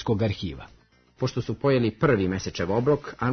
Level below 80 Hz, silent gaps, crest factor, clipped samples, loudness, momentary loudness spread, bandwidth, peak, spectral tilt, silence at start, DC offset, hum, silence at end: -50 dBFS; none; 18 dB; under 0.1%; -25 LUFS; 9 LU; 6.6 kHz; -8 dBFS; -7 dB/octave; 0 s; under 0.1%; none; 0 s